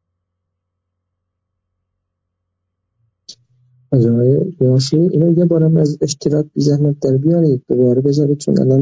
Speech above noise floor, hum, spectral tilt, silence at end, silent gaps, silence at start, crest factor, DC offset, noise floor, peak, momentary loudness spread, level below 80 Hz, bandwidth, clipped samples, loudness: 62 dB; none; -8 dB/octave; 0 s; none; 3.3 s; 12 dB; under 0.1%; -75 dBFS; -2 dBFS; 4 LU; -54 dBFS; 7.8 kHz; under 0.1%; -14 LUFS